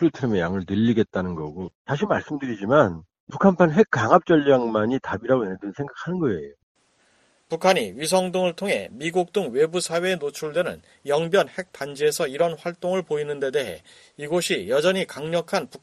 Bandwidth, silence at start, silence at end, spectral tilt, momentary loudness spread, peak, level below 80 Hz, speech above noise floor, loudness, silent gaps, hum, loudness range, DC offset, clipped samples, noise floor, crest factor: 13 kHz; 0 s; 0.05 s; -5.5 dB/octave; 14 LU; 0 dBFS; -58 dBFS; 40 dB; -23 LUFS; 1.75-1.85 s, 3.20-3.27 s, 6.63-6.75 s; none; 5 LU; under 0.1%; under 0.1%; -63 dBFS; 22 dB